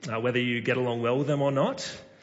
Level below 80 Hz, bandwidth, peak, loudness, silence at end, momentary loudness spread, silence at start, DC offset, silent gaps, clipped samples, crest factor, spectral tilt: -70 dBFS; 8 kHz; -14 dBFS; -27 LUFS; 0.15 s; 5 LU; 0 s; under 0.1%; none; under 0.1%; 14 dB; -6 dB/octave